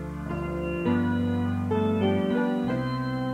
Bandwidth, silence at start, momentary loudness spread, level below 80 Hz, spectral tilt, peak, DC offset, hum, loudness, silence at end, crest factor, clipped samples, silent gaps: 10 kHz; 0 s; 6 LU; -46 dBFS; -8.5 dB/octave; -12 dBFS; under 0.1%; none; -27 LUFS; 0 s; 14 dB; under 0.1%; none